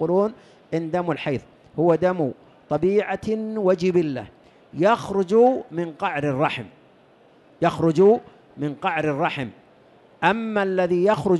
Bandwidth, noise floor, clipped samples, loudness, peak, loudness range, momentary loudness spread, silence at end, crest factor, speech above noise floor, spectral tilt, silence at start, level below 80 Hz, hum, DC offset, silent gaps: 11.5 kHz; -54 dBFS; under 0.1%; -22 LUFS; -6 dBFS; 2 LU; 13 LU; 0 s; 16 dB; 33 dB; -7 dB/octave; 0 s; -58 dBFS; none; under 0.1%; none